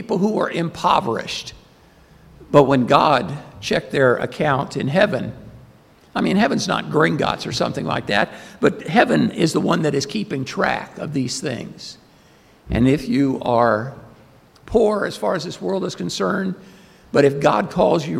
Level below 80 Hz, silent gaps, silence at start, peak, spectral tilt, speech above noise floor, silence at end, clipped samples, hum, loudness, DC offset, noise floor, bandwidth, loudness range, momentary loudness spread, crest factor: -46 dBFS; none; 0 s; 0 dBFS; -5.5 dB/octave; 32 dB; 0 s; under 0.1%; none; -19 LUFS; under 0.1%; -51 dBFS; 15.5 kHz; 4 LU; 12 LU; 20 dB